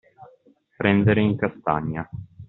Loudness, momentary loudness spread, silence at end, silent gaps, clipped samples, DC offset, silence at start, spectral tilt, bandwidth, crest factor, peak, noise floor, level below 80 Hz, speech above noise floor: -22 LUFS; 13 LU; 0.05 s; none; under 0.1%; under 0.1%; 0.2 s; -6 dB/octave; 4.1 kHz; 20 dB; -4 dBFS; -58 dBFS; -52 dBFS; 36 dB